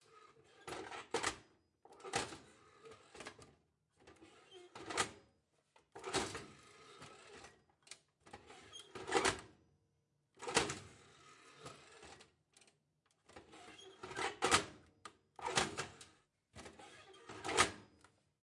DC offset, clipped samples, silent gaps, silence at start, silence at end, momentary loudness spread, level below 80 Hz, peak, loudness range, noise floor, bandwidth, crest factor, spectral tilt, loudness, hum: under 0.1%; under 0.1%; none; 0.1 s; 0.55 s; 25 LU; -72 dBFS; -14 dBFS; 9 LU; -81 dBFS; 11.5 kHz; 30 dB; -2 dB/octave; -40 LUFS; none